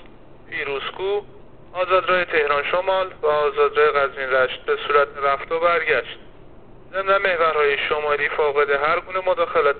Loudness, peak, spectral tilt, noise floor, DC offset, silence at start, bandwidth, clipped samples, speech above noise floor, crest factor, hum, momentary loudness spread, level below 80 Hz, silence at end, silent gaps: -20 LUFS; -4 dBFS; -0.5 dB/octave; -45 dBFS; 0.6%; 0 s; 4.6 kHz; under 0.1%; 25 dB; 18 dB; none; 8 LU; -50 dBFS; 0 s; none